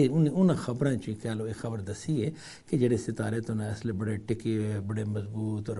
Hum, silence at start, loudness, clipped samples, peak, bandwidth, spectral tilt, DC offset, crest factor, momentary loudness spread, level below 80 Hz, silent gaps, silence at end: none; 0 s; -30 LUFS; under 0.1%; -12 dBFS; 11.5 kHz; -7.5 dB/octave; under 0.1%; 16 dB; 9 LU; -58 dBFS; none; 0 s